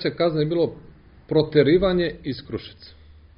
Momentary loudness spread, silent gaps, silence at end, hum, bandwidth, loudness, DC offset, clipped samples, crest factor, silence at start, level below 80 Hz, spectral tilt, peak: 16 LU; none; 0.5 s; none; 5.4 kHz; -22 LUFS; under 0.1%; under 0.1%; 18 dB; 0 s; -46 dBFS; -5.5 dB/octave; -4 dBFS